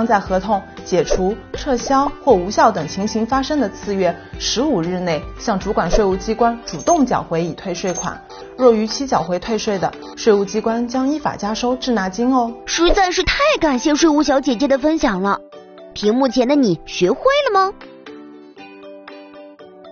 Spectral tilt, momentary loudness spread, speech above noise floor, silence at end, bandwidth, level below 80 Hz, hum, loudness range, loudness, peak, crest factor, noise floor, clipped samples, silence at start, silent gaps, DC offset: -4 dB/octave; 9 LU; 22 dB; 0 s; 7 kHz; -34 dBFS; none; 3 LU; -18 LUFS; 0 dBFS; 18 dB; -39 dBFS; under 0.1%; 0 s; none; under 0.1%